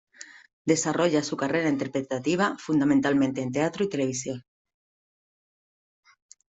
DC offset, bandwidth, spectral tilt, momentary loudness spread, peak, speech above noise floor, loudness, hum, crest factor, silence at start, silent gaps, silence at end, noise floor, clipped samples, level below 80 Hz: under 0.1%; 8.2 kHz; -5 dB/octave; 13 LU; -8 dBFS; over 65 dB; -26 LUFS; none; 18 dB; 0.2 s; 0.53-0.65 s; 2.15 s; under -90 dBFS; under 0.1%; -66 dBFS